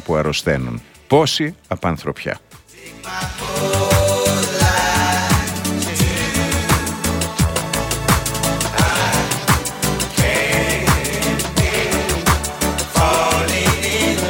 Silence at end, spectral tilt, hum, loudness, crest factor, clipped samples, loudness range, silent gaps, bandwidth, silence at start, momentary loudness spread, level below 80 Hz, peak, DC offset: 0 s; -4 dB/octave; none; -17 LUFS; 18 dB; under 0.1%; 3 LU; none; 17 kHz; 0 s; 8 LU; -30 dBFS; 0 dBFS; under 0.1%